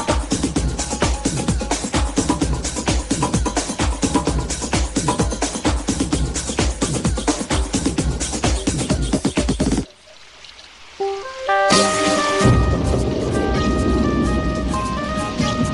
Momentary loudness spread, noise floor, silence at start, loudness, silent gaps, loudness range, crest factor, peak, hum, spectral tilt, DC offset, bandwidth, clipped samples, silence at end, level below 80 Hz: 7 LU; -44 dBFS; 0 s; -20 LUFS; none; 4 LU; 18 dB; -2 dBFS; none; -4.5 dB/octave; under 0.1%; 11.5 kHz; under 0.1%; 0 s; -26 dBFS